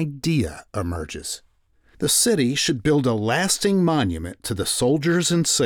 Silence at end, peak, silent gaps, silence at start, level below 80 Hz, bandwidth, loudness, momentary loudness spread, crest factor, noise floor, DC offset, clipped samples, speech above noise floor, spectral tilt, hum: 0 s; -8 dBFS; none; 0 s; -44 dBFS; over 20 kHz; -21 LUFS; 11 LU; 14 dB; -59 dBFS; under 0.1%; under 0.1%; 38 dB; -4 dB/octave; none